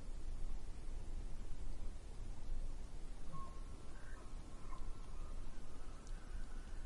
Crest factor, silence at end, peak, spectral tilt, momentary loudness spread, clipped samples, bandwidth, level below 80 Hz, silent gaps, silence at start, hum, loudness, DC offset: 12 dB; 0 s; -30 dBFS; -5.5 dB/octave; 4 LU; under 0.1%; 11 kHz; -46 dBFS; none; 0 s; none; -54 LUFS; under 0.1%